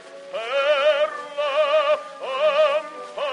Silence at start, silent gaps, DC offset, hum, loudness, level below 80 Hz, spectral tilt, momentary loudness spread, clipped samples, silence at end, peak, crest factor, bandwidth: 0 s; none; under 0.1%; none; -21 LUFS; -82 dBFS; -1 dB/octave; 11 LU; under 0.1%; 0 s; -8 dBFS; 14 dB; 10.5 kHz